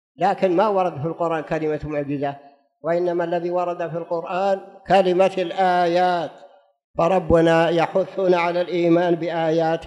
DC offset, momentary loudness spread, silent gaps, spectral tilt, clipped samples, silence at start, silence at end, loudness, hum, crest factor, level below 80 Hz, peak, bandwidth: under 0.1%; 9 LU; 6.84-6.94 s; -7 dB/octave; under 0.1%; 0.2 s; 0 s; -21 LUFS; none; 16 dB; -50 dBFS; -4 dBFS; 10.5 kHz